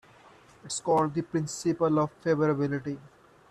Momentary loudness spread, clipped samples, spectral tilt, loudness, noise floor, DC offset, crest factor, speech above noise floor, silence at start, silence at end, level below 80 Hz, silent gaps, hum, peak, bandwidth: 9 LU; under 0.1%; -6 dB/octave; -28 LUFS; -55 dBFS; under 0.1%; 16 dB; 28 dB; 0.65 s; 0.45 s; -64 dBFS; none; none; -14 dBFS; 13 kHz